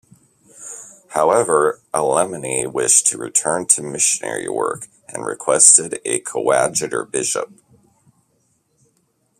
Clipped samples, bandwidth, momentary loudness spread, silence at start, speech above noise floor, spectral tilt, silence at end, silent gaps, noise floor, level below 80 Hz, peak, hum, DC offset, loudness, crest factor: under 0.1%; 15.5 kHz; 19 LU; 0.6 s; 46 dB; -2 dB/octave; 1.95 s; none; -64 dBFS; -62 dBFS; 0 dBFS; none; under 0.1%; -16 LUFS; 20 dB